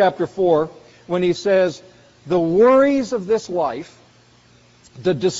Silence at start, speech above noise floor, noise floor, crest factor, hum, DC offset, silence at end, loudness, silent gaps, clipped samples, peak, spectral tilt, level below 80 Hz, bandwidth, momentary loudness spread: 0 s; 34 dB; -52 dBFS; 14 dB; none; under 0.1%; 0 s; -18 LUFS; none; under 0.1%; -4 dBFS; -5 dB/octave; -56 dBFS; 8 kHz; 12 LU